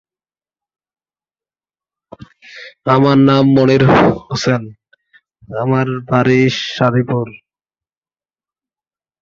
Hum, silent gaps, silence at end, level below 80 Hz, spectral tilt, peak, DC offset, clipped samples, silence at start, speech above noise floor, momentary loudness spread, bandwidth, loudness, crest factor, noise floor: none; none; 1.9 s; -48 dBFS; -7 dB/octave; -2 dBFS; under 0.1%; under 0.1%; 2.5 s; over 77 dB; 13 LU; 7.4 kHz; -13 LUFS; 16 dB; under -90 dBFS